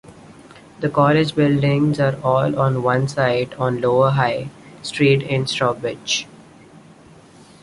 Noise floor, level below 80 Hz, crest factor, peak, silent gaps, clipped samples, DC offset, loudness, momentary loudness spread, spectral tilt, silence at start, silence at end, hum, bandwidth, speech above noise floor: -46 dBFS; -54 dBFS; 18 dB; -2 dBFS; none; under 0.1%; under 0.1%; -19 LUFS; 10 LU; -6 dB/octave; 0.1 s; 1.4 s; none; 11.5 kHz; 28 dB